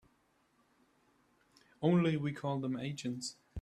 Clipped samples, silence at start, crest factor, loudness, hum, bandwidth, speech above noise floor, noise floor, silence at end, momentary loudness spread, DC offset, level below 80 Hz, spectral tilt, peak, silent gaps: under 0.1%; 1.8 s; 20 dB; -35 LUFS; none; 11.5 kHz; 40 dB; -74 dBFS; 0 s; 11 LU; under 0.1%; -74 dBFS; -6.5 dB/octave; -18 dBFS; none